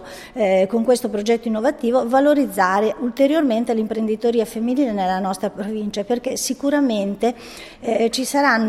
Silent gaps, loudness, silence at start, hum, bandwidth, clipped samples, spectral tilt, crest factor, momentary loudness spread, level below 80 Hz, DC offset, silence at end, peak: none; -20 LUFS; 0 s; none; 15.5 kHz; under 0.1%; -4.5 dB/octave; 16 dB; 8 LU; -54 dBFS; under 0.1%; 0 s; -4 dBFS